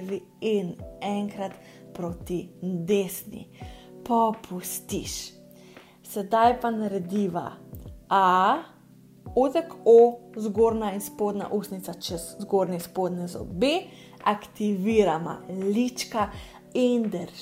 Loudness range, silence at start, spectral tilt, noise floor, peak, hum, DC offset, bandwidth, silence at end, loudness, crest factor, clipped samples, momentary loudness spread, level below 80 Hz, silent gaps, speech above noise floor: 7 LU; 0 s; -5.5 dB/octave; -52 dBFS; -6 dBFS; none; under 0.1%; 16 kHz; 0 s; -26 LUFS; 20 dB; under 0.1%; 15 LU; -54 dBFS; none; 27 dB